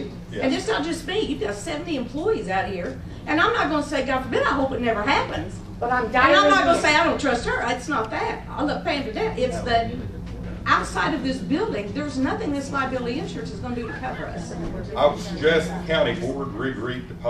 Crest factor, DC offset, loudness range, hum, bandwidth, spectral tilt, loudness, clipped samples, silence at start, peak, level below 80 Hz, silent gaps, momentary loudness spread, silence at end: 20 dB; under 0.1%; 6 LU; none; 13.5 kHz; -5 dB/octave; -23 LUFS; under 0.1%; 0 s; -4 dBFS; -40 dBFS; none; 13 LU; 0 s